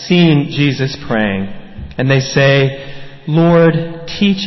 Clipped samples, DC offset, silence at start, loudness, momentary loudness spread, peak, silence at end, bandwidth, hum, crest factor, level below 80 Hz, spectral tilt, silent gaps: under 0.1%; under 0.1%; 0 s; -13 LUFS; 18 LU; 0 dBFS; 0 s; 6.2 kHz; none; 12 dB; -40 dBFS; -6.5 dB/octave; none